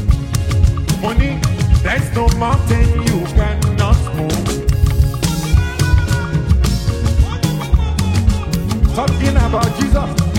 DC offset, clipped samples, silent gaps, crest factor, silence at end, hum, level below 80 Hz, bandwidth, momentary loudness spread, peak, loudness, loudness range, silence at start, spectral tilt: under 0.1%; under 0.1%; none; 14 dB; 0 s; none; -18 dBFS; 16.5 kHz; 3 LU; 0 dBFS; -16 LUFS; 1 LU; 0 s; -6 dB/octave